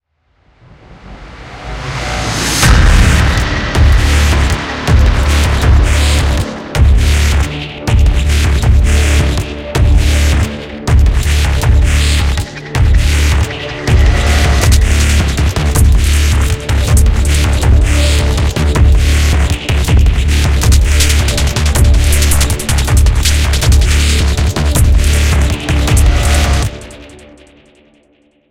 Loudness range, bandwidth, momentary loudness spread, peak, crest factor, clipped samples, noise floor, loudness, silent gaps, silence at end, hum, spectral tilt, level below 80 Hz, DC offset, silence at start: 1 LU; 16 kHz; 6 LU; 0 dBFS; 10 dB; under 0.1%; -54 dBFS; -11 LUFS; none; 1.45 s; none; -4.5 dB/octave; -12 dBFS; under 0.1%; 0.9 s